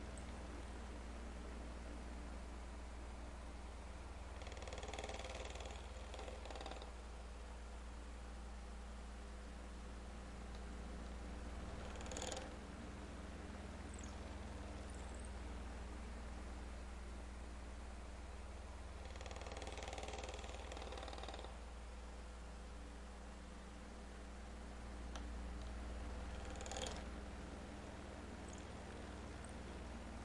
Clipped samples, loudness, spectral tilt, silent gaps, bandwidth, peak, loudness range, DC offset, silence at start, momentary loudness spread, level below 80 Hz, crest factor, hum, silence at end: under 0.1%; -52 LUFS; -4.5 dB/octave; none; 11.5 kHz; -30 dBFS; 3 LU; under 0.1%; 0 s; 5 LU; -52 dBFS; 20 dB; none; 0 s